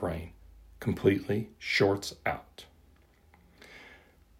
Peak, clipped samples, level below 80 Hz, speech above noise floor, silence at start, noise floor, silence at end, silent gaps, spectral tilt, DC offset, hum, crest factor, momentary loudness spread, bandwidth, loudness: -10 dBFS; under 0.1%; -56 dBFS; 31 dB; 0 s; -61 dBFS; 0.45 s; none; -5.5 dB/octave; under 0.1%; none; 24 dB; 25 LU; 16 kHz; -30 LUFS